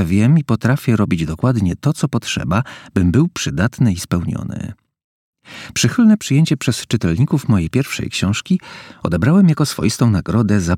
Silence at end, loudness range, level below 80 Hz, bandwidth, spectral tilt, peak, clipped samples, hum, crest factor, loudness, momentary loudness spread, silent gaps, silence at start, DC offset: 0 s; 3 LU; -40 dBFS; 16 kHz; -6 dB/octave; 0 dBFS; under 0.1%; none; 16 dB; -17 LUFS; 9 LU; 5.04-5.33 s; 0 s; under 0.1%